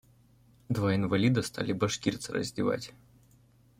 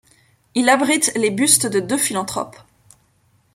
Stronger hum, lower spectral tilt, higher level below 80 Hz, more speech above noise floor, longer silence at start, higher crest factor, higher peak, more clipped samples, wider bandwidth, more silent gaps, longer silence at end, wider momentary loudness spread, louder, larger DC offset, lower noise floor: neither; first, -5.5 dB/octave vs -2 dB/octave; about the same, -60 dBFS vs -62 dBFS; second, 32 dB vs 42 dB; first, 0.7 s vs 0.55 s; about the same, 18 dB vs 20 dB; second, -12 dBFS vs 0 dBFS; neither; about the same, 16 kHz vs 16.5 kHz; neither; second, 0.9 s vs 1.05 s; second, 8 LU vs 12 LU; second, -30 LUFS vs -17 LUFS; neither; about the same, -62 dBFS vs -60 dBFS